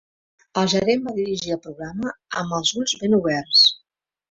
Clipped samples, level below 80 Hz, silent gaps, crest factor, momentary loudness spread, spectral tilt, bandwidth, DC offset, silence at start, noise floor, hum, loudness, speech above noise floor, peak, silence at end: under 0.1%; -58 dBFS; none; 18 dB; 15 LU; -3.5 dB/octave; 8 kHz; under 0.1%; 0.55 s; -71 dBFS; none; -20 LUFS; 50 dB; -4 dBFS; 0.55 s